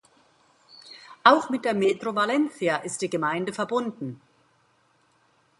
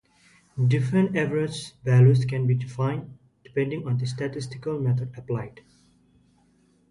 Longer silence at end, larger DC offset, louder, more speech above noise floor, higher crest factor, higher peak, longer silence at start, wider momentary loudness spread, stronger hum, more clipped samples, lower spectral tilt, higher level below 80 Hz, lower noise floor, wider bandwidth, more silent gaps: about the same, 1.45 s vs 1.4 s; neither; about the same, -24 LUFS vs -25 LUFS; about the same, 41 dB vs 39 dB; first, 26 dB vs 18 dB; first, -2 dBFS vs -8 dBFS; first, 0.85 s vs 0.55 s; first, 18 LU vs 13 LU; second, none vs 50 Hz at -55 dBFS; neither; second, -4.5 dB/octave vs -7.5 dB/octave; second, -74 dBFS vs -58 dBFS; about the same, -65 dBFS vs -62 dBFS; about the same, 11.5 kHz vs 11 kHz; neither